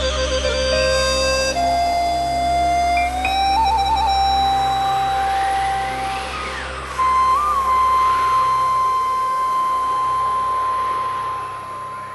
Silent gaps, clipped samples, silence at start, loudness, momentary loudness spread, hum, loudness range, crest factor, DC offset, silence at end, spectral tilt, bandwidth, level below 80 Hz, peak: none; under 0.1%; 0 s; -18 LUFS; 8 LU; none; 2 LU; 12 dB; 0.1%; 0 s; -3 dB/octave; 13 kHz; -34 dBFS; -6 dBFS